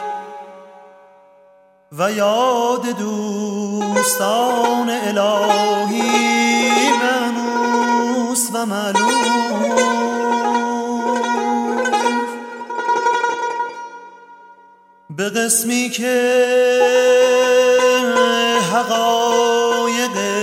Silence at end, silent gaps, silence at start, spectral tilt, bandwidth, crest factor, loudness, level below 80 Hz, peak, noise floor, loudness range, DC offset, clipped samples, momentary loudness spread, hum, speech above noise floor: 0 s; none; 0 s; -2.5 dB/octave; 16.5 kHz; 16 dB; -16 LUFS; -74 dBFS; -2 dBFS; -51 dBFS; 7 LU; under 0.1%; under 0.1%; 9 LU; none; 35 dB